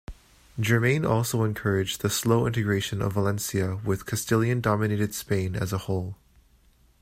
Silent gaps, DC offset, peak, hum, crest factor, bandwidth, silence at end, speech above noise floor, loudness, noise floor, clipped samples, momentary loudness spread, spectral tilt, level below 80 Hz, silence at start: none; under 0.1%; -8 dBFS; none; 18 dB; 16 kHz; 0.85 s; 35 dB; -26 LUFS; -60 dBFS; under 0.1%; 7 LU; -5.5 dB/octave; -52 dBFS; 0.1 s